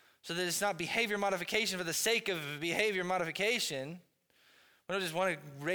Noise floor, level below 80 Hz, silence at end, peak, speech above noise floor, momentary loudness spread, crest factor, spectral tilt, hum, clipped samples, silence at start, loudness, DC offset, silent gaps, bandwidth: -68 dBFS; -74 dBFS; 0 s; -16 dBFS; 34 dB; 8 LU; 18 dB; -2.5 dB/octave; none; under 0.1%; 0.25 s; -33 LUFS; under 0.1%; none; over 20 kHz